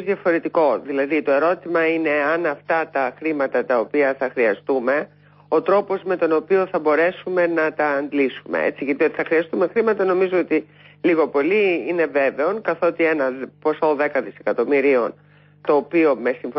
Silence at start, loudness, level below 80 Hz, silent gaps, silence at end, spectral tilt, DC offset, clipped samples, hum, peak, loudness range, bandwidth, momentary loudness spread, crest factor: 0 s; -20 LUFS; -72 dBFS; none; 0 s; -10.5 dB/octave; under 0.1%; under 0.1%; none; -8 dBFS; 1 LU; 5.8 kHz; 5 LU; 12 dB